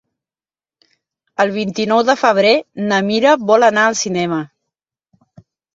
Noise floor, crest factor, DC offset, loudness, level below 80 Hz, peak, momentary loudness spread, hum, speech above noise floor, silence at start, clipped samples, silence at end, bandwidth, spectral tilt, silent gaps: under -90 dBFS; 16 dB; under 0.1%; -14 LUFS; -62 dBFS; 0 dBFS; 9 LU; none; over 76 dB; 1.4 s; under 0.1%; 1.3 s; 7.8 kHz; -4 dB/octave; none